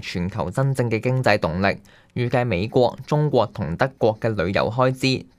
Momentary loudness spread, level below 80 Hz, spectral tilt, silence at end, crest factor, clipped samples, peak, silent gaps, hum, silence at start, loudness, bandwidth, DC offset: 6 LU; -48 dBFS; -6.5 dB/octave; 0.15 s; 20 dB; under 0.1%; 0 dBFS; none; none; 0 s; -22 LUFS; 14 kHz; under 0.1%